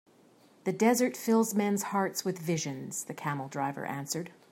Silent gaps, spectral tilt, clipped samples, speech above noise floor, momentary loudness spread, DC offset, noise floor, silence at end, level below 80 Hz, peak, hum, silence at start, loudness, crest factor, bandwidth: none; -4.5 dB/octave; under 0.1%; 30 dB; 10 LU; under 0.1%; -61 dBFS; 0.2 s; -78 dBFS; -12 dBFS; none; 0.65 s; -31 LUFS; 20 dB; 16.5 kHz